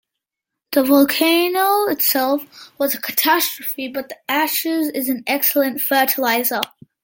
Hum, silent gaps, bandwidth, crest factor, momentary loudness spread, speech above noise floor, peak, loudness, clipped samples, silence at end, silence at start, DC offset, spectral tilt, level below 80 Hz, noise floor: none; none; 17 kHz; 18 dB; 10 LU; 65 dB; -2 dBFS; -17 LUFS; under 0.1%; 0.4 s; 0.7 s; under 0.1%; -1.5 dB/octave; -68 dBFS; -83 dBFS